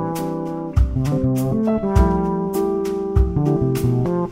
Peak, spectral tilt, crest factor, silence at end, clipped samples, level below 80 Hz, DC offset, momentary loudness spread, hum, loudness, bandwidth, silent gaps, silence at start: -4 dBFS; -8.5 dB/octave; 16 dB; 0 s; under 0.1%; -26 dBFS; under 0.1%; 6 LU; none; -20 LUFS; 16 kHz; none; 0 s